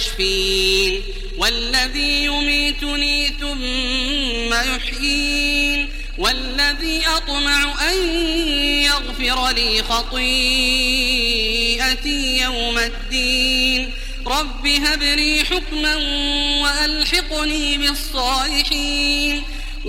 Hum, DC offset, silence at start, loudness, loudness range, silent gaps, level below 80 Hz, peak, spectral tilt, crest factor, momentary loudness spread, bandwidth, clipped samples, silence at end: none; under 0.1%; 0 s; -17 LUFS; 2 LU; none; -26 dBFS; -2 dBFS; -2 dB/octave; 16 dB; 6 LU; 16.5 kHz; under 0.1%; 0 s